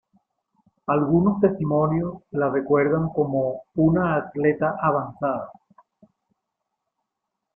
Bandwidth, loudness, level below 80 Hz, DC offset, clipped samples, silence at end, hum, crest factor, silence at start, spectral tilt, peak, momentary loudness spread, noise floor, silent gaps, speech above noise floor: 3.3 kHz; -22 LUFS; -54 dBFS; under 0.1%; under 0.1%; 2.05 s; none; 18 dB; 0.9 s; -13 dB/octave; -6 dBFS; 7 LU; -82 dBFS; none; 60 dB